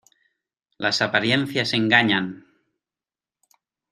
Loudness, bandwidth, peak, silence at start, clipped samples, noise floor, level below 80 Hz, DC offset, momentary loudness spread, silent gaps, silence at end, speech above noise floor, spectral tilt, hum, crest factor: -20 LUFS; 14 kHz; -2 dBFS; 0.8 s; under 0.1%; under -90 dBFS; -66 dBFS; under 0.1%; 8 LU; none; 1.55 s; over 69 dB; -4.5 dB/octave; none; 24 dB